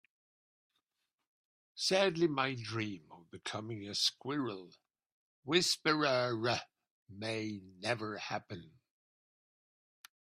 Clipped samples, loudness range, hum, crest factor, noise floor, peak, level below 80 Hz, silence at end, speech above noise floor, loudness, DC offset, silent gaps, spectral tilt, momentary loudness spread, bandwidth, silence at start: under 0.1%; 8 LU; none; 24 dB; -88 dBFS; -14 dBFS; -78 dBFS; 1.6 s; 52 dB; -35 LUFS; under 0.1%; 5.12-5.43 s, 6.91-7.06 s; -3.5 dB/octave; 18 LU; 15 kHz; 1.75 s